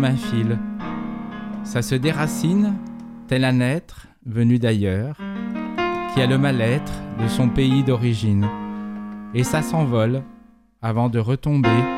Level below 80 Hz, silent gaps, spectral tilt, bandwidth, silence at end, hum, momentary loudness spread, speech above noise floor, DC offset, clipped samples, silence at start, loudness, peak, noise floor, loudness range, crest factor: -44 dBFS; none; -6.5 dB/octave; 15 kHz; 0 s; none; 12 LU; 30 dB; under 0.1%; under 0.1%; 0 s; -21 LUFS; -6 dBFS; -49 dBFS; 2 LU; 16 dB